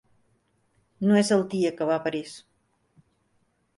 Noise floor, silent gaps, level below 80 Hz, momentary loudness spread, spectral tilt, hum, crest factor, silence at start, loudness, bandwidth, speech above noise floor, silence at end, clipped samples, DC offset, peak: -70 dBFS; none; -70 dBFS; 17 LU; -5.5 dB/octave; none; 18 dB; 1 s; -25 LUFS; 11.5 kHz; 46 dB; 1.4 s; under 0.1%; under 0.1%; -10 dBFS